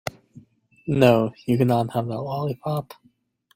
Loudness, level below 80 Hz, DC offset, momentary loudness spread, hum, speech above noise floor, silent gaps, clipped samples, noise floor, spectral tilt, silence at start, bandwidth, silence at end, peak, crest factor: -22 LUFS; -58 dBFS; under 0.1%; 16 LU; none; 41 dB; none; under 0.1%; -63 dBFS; -7.5 dB/octave; 0.85 s; 16.5 kHz; 0.65 s; -2 dBFS; 20 dB